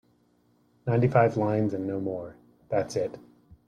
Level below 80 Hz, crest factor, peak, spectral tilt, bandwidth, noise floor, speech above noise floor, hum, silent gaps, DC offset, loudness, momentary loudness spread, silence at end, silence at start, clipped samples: -62 dBFS; 20 dB; -8 dBFS; -8 dB/octave; 10.5 kHz; -66 dBFS; 40 dB; 60 Hz at -50 dBFS; none; under 0.1%; -27 LUFS; 14 LU; 0.5 s; 0.85 s; under 0.1%